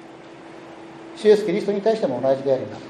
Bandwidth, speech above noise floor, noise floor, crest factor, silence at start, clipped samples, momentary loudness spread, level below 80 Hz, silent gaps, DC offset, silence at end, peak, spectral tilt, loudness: 10.5 kHz; 21 dB; -41 dBFS; 18 dB; 0 s; under 0.1%; 23 LU; -70 dBFS; none; under 0.1%; 0 s; -4 dBFS; -6.5 dB/octave; -20 LUFS